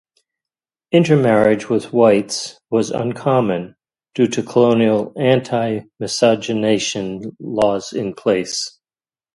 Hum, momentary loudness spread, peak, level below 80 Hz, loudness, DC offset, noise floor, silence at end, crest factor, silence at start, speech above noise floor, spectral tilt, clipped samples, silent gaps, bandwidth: none; 11 LU; 0 dBFS; -56 dBFS; -17 LUFS; under 0.1%; under -90 dBFS; 0.65 s; 18 dB; 0.9 s; over 73 dB; -5.5 dB/octave; under 0.1%; none; 11.5 kHz